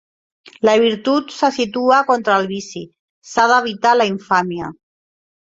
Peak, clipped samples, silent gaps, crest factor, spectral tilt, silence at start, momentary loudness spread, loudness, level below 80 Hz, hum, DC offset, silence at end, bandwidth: 0 dBFS; under 0.1%; 2.99-3.22 s; 16 dB; -4 dB/octave; 0.45 s; 13 LU; -16 LUFS; -60 dBFS; none; under 0.1%; 0.85 s; 7.8 kHz